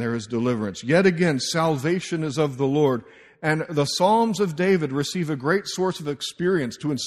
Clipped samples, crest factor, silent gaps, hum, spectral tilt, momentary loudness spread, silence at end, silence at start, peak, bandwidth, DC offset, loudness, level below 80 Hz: under 0.1%; 18 dB; none; none; -5.5 dB/octave; 7 LU; 0 s; 0 s; -4 dBFS; 14 kHz; under 0.1%; -23 LUFS; -60 dBFS